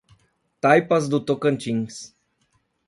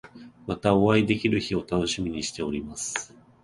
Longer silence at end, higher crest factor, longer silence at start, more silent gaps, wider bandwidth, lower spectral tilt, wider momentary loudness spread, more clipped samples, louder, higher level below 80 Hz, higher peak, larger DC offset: first, 0.8 s vs 0.4 s; about the same, 20 dB vs 20 dB; first, 0.65 s vs 0.05 s; neither; about the same, 11.5 kHz vs 11.5 kHz; about the same, -6 dB/octave vs -5 dB/octave; first, 17 LU vs 13 LU; neither; first, -21 LUFS vs -26 LUFS; second, -64 dBFS vs -50 dBFS; first, -2 dBFS vs -6 dBFS; neither